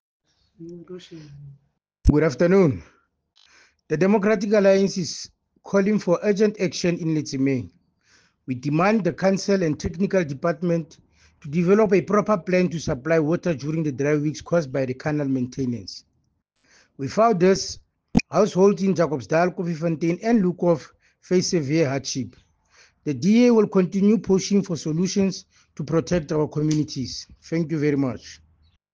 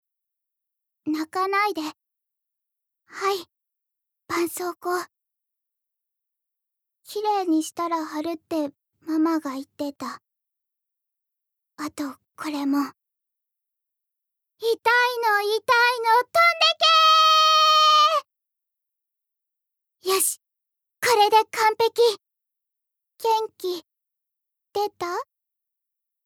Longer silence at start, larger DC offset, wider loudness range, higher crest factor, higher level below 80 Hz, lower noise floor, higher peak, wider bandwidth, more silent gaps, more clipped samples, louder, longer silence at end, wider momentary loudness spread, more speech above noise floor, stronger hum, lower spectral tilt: second, 0.6 s vs 1.05 s; neither; second, 4 LU vs 15 LU; about the same, 18 dB vs 18 dB; first, -42 dBFS vs -78 dBFS; second, -70 dBFS vs -84 dBFS; about the same, -4 dBFS vs -6 dBFS; second, 7.8 kHz vs over 20 kHz; neither; neither; about the same, -22 LUFS vs -21 LUFS; second, 0.6 s vs 1.05 s; second, 15 LU vs 19 LU; second, 48 dB vs 62 dB; neither; first, -6.5 dB/octave vs -1 dB/octave